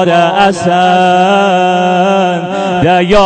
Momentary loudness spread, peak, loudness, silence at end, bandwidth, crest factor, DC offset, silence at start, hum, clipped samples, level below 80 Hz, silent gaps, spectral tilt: 4 LU; 0 dBFS; -9 LUFS; 0 s; 9 kHz; 8 dB; under 0.1%; 0 s; none; under 0.1%; -36 dBFS; none; -5.5 dB/octave